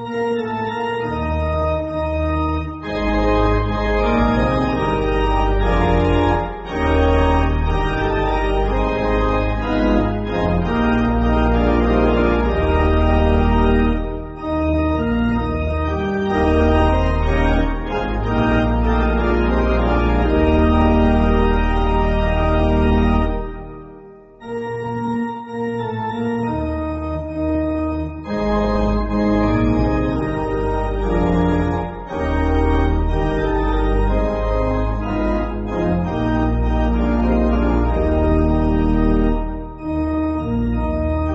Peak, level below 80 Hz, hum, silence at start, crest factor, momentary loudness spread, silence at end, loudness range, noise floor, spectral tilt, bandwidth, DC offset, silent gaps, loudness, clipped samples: -2 dBFS; -22 dBFS; none; 0 s; 14 dB; 7 LU; 0 s; 5 LU; -41 dBFS; -6.5 dB/octave; 7.6 kHz; under 0.1%; none; -19 LUFS; under 0.1%